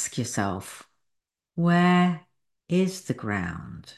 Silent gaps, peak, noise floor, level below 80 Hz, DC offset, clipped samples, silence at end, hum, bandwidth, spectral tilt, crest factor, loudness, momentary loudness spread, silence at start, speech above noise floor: none; -8 dBFS; -80 dBFS; -54 dBFS; under 0.1%; under 0.1%; 0.05 s; none; 12.5 kHz; -5.5 dB/octave; 18 dB; -25 LUFS; 18 LU; 0 s; 55 dB